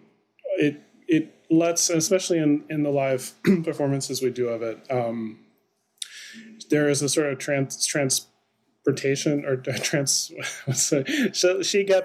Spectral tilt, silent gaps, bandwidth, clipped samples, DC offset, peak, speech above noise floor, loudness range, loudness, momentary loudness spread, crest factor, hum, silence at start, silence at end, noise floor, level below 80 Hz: -4 dB/octave; none; 16 kHz; under 0.1%; under 0.1%; -8 dBFS; 46 dB; 4 LU; -24 LUFS; 11 LU; 16 dB; none; 0.45 s; 0 s; -69 dBFS; -78 dBFS